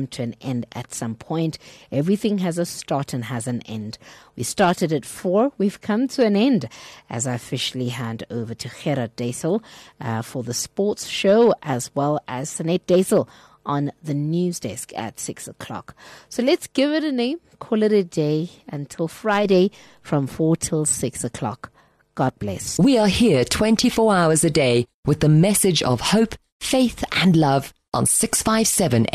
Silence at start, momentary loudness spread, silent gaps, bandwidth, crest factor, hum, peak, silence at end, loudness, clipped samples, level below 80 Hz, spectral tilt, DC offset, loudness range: 0 s; 14 LU; 24.94-25.03 s, 26.52-26.60 s; 13 kHz; 14 dB; none; -8 dBFS; 0.1 s; -21 LUFS; under 0.1%; -50 dBFS; -5 dB/octave; under 0.1%; 7 LU